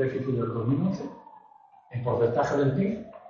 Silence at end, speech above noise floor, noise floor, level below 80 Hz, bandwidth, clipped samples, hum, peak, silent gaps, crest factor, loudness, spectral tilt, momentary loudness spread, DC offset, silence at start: 0 s; 29 dB; -55 dBFS; -58 dBFS; 7.2 kHz; under 0.1%; none; -12 dBFS; none; 14 dB; -27 LUFS; -8.5 dB/octave; 10 LU; under 0.1%; 0 s